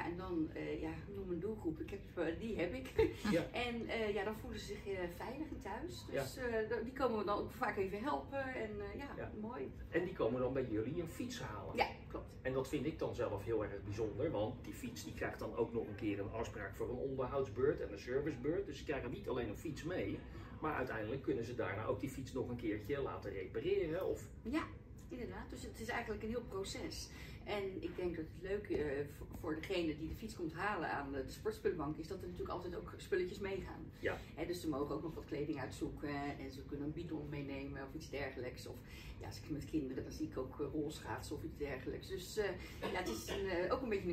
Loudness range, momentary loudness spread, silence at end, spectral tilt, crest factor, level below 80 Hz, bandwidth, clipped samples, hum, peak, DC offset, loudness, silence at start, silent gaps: 4 LU; 8 LU; 0 s; -6 dB/octave; 22 dB; -56 dBFS; 16 kHz; under 0.1%; none; -20 dBFS; under 0.1%; -42 LUFS; 0 s; none